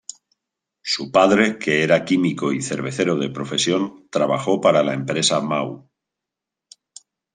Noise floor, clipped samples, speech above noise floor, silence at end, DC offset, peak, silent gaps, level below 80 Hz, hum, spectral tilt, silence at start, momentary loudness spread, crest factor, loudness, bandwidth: -85 dBFS; under 0.1%; 66 dB; 1.55 s; under 0.1%; -2 dBFS; none; -62 dBFS; none; -4 dB/octave; 0.85 s; 9 LU; 20 dB; -19 LUFS; 10 kHz